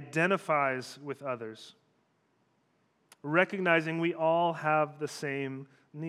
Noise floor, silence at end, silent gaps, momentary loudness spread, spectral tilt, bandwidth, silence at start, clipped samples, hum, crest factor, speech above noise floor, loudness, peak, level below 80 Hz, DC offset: -73 dBFS; 0 s; none; 16 LU; -5.5 dB/octave; 14.5 kHz; 0 s; under 0.1%; none; 22 dB; 42 dB; -30 LUFS; -10 dBFS; under -90 dBFS; under 0.1%